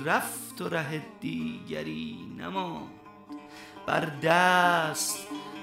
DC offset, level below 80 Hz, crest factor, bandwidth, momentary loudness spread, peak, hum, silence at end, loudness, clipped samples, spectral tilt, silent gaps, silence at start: under 0.1%; -66 dBFS; 20 dB; 16 kHz; 21 LU; -8 dBFS; none; 0 s; -29 LUFS; under 0.1%; -3.5 dB/octave; none; 0 s